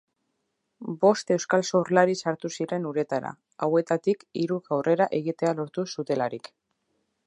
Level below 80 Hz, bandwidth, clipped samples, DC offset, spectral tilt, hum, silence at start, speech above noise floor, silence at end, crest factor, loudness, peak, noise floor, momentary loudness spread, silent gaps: -76 dBFS; 11 kHz; under 0.1%; under 0.1%; -5.5 dB/octave; none; 0.8 s; 52 dB; 0.9 s; 22 dB; -26 LUFS; -4 dBFS; -78 dBFS; 9 LU; none